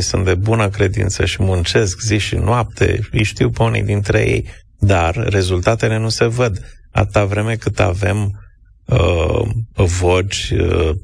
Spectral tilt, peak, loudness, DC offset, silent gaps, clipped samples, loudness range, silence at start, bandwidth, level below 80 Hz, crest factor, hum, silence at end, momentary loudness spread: -5.5 dB/octave; -2 dBFS; -16 LUFS; under 0.1%; none; under 0.1%; 2 LU; 0 s; 10.5 kHz; -28 dBFS; 14 dB; none; 0 s; 4 LU